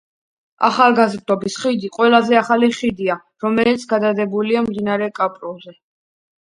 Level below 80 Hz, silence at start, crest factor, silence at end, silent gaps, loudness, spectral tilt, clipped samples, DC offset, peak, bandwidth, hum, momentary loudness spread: -60 dBFS; 0.6 s; 18 dB; 0.8 s; none; -17 LUFS; -5 dB/octave; under 0.1%; under 0.1%; 0 dBFS; 11 kHz; none; 9 LU